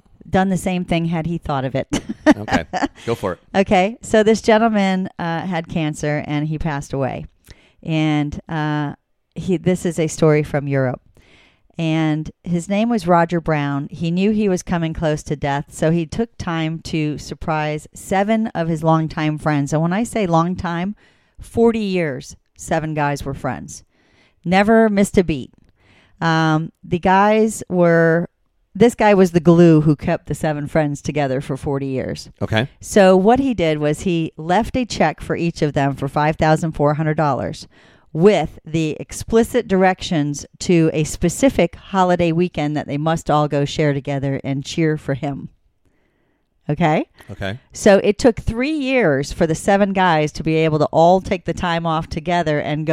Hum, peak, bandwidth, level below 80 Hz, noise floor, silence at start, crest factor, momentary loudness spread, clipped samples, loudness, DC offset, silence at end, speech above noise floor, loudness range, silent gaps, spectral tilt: none; 0 dBFS; 14 kHz; -40 dBFS; -63 dBFS; 0.25 s; 18 dB; 11 LU; under 0.1%; -18 LUFS; under 0.1%; 0 s; 46 dB; 6 LU; none; -6.5 dB/octave